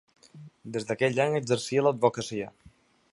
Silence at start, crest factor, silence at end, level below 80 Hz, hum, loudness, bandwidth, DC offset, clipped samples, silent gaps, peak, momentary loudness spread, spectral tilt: 0.35 s; 20 dB; 0.65 s; -68 dBFS; none; -27 LUFS; 11.5 kHz; under 0.1%; under 0.1%; none; -8 dBFS; 12 LU; -5 dB/octave